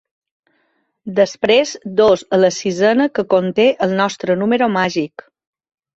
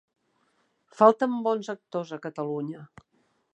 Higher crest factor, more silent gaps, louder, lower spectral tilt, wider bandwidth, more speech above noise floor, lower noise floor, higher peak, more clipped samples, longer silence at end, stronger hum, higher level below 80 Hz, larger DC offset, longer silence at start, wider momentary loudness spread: second, 16 dB vs 24 dB; neither; first, -16 LUFS vs -26 LUFS; second, -5 dB/octave vs -7 dB/octave; about the same, 8 kHz vs 8.6 kHz; first, 50 dB vs 45 dB; second, -65 dBFS vs -71 dBFS; about the same, -2 dBFS vs -4 dBFS; neither; first, 0.9 s vs 0.7 s; neither; first, -56 dBFS vs -78 dBFS; neither; about the same, 1.05 s vs 1 s; second, 6 LU vs 16 LU